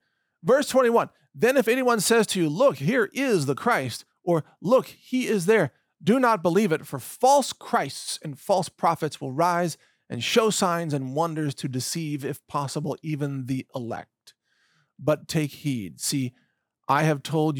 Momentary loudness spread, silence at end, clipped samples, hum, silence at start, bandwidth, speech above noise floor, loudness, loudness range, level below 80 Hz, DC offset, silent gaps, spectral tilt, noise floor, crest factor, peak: 11 LU; 0 s; under 0.1%; none; 0.45 s; 20 kHz; 44 dB; -24 LUFS; 8 LU; -72 dBFS; under 0.1%; none; -5 dB/octave; -68 dBFS; 16 dB; -8 dBFS